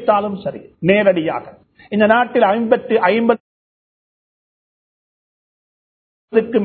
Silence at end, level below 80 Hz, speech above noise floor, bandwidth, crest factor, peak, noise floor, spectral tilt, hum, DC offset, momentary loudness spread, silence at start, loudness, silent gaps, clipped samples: 0 s; -58 dBFS; over 75 dB; 4.5 kHz; 18 dB; 0 dBFS; under -90 dBFS; -10 dB/octave; none; under 0.1%; 11 LU; 0 s; -16 LUFS; 3.40-6.28 s; under 0.1%